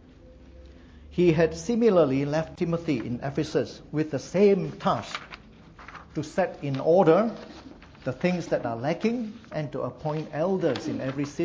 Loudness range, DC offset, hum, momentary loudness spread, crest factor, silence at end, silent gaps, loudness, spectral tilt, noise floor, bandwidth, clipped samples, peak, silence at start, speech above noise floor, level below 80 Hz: 4 LU; under 0.1%; none; 15 LU; 20 dB; 0 s; none; -26 LUFS; -7 dB/octave; -50 dBFS; 8 kHz; under 0.1%; -6 dBFS; 0.25 s; 24 dB; -54 dBFS